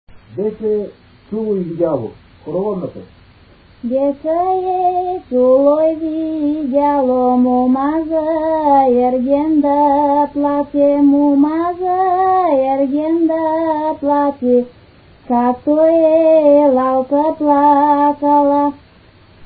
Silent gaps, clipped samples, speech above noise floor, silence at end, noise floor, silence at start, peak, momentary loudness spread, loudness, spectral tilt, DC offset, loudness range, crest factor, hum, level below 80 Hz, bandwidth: none; under 0.1%; 32 dB; 0 s; -46 dBFS; 0.15 s; -2 dBFS; 10 LU; -14 LUFS; -12.5 dB/octave; under 0.1%; 8 LU; 12 dB; none; -50 dBFS; 4.8 kHz